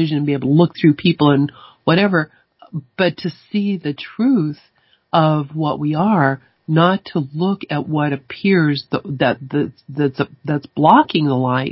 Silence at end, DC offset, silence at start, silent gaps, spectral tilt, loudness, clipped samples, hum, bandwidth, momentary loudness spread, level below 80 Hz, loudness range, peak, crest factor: 0 s; under 0.1%; 0 s; none; -10.5 dB/octave; -17 LUFS; under 0.1%; none; 5.8 kHz; 10 LU; -58 dBFS; 3 LU; 0 dBFS; 18 dB